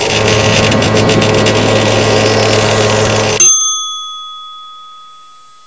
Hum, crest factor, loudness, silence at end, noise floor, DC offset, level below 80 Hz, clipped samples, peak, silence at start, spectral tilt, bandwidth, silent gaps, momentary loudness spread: none; 12 dB; -9 LUFS; 0.6 s; -39 dBFS; 0.8%; -32 dBFS; 0.1%; 0 dBFS; 0 s; -3 dB/octave; 8 kHz; none; 18 LU